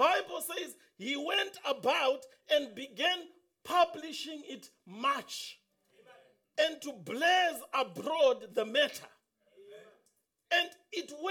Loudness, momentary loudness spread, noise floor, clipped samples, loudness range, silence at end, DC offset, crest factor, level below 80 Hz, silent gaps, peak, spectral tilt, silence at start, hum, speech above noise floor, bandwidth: -32 LUFS; 14 LU; -76 dBFS; under 0.1%; 5 LU; 0 s; under 0.1%; 20 dB; -82 dBFS; none; -14 dBFS; -2 dB/octave; 0 s; none; 44 dB; 19.5 kHz